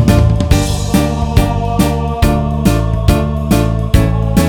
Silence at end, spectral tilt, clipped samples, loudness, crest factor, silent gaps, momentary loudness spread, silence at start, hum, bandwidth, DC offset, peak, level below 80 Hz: 0 s; -6.5 dB/octave; 0.3%; -13 LUFS; 12 dB; none; 2 LU; 0 s; none; 19.5 kHz; under 0.1%; 0 dBFS; -18 dBFS